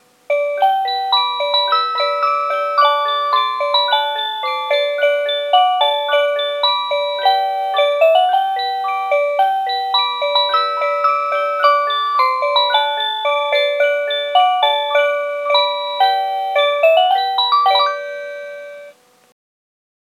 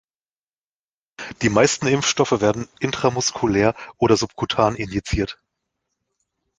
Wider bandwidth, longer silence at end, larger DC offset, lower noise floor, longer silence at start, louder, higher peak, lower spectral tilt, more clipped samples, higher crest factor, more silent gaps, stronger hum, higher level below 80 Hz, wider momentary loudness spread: first, 13.5 kHz vs 10 kHz; about the same, 1.15 s vs 1.25 s; neither; second, -43 dBFS vs under -90 dBFS; second, 0.3 s vs 1.2 s; first, -15 LUFS vs -20 LUFS; about the same, 0 dBFS vs 0 dBFS; second, 1 dB/octave vs -4 dB/octave; neither; second, 16 dB vs 22 dB; neither; neither; second, -90 dBFS vs -42 dBFS; about the same, 6 LU vs 8 LU